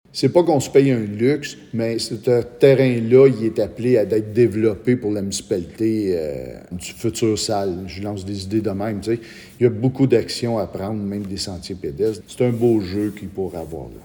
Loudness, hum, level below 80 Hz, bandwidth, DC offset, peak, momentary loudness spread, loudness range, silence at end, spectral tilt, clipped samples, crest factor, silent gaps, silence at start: -20 LUFS; none; -50 dBFS; 19 kHz; under 0.1%; 0 dBFS; 13 LU; 6 LU; 0.05 s; -6 dB/octave; under 0.1%; 20 dB; none; 0.15 s